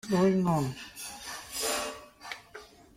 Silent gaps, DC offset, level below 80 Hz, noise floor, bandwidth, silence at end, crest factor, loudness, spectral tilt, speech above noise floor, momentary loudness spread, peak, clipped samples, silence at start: none; under 0.1%; -60 dBFS; -51 dBFS; 16.5 kHz; 0.3 s; 16 dB; -31 LUFS; -5 dB/octave; 23 dB; 19 LU; -14 dBFS; under 0.1%; 0.05 s